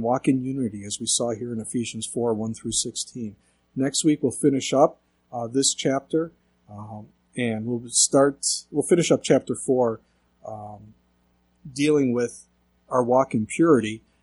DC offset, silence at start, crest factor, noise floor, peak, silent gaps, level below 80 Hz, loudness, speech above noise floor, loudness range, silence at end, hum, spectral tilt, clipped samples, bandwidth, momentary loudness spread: under 0.1%; 0 s; 20 dB; -65 dBFS; -4 dBFS; none; -62 dBFS; -23 LUFS; 42 dB; 5 LU; 0.25 s; none; -4 dB/octave; under 0.1%; 12 kHz; 18 LU